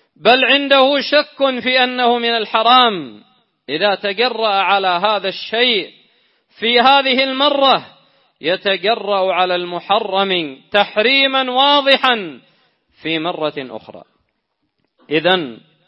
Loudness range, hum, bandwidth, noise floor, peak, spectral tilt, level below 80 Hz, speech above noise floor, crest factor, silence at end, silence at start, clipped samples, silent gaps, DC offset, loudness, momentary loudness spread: 4 LU; none; 5.8 kHz; -70 dBFS; 0 dBFS; -5.5 dB/octave; -68 dBFS; 55 dB; 16 dB; 0.3 s; 0.25 s; under 0.1%; none; under 0.1%; -14 LUFS; 11 LU